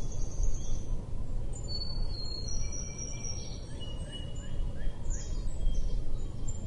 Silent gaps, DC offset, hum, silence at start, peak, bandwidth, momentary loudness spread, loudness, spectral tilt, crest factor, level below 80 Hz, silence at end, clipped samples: none; under 0.1%; none; 0 s; -16 dBFS; 9 kHz; 4 LU; -39 LUFS; -4 dB/octave; 14 dB; -34 dBFS; 0 s; under 0.1%